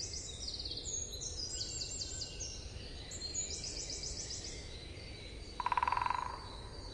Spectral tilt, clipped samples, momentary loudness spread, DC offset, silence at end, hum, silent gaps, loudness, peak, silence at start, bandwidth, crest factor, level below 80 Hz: -1.5 dB/octave; under 0.1%; 13 LU; under 0.1%; 0 s; none; none; -40 LUFS; -18 dBFS; 0 s; 12 kHz; 24 dB; -52 dBFS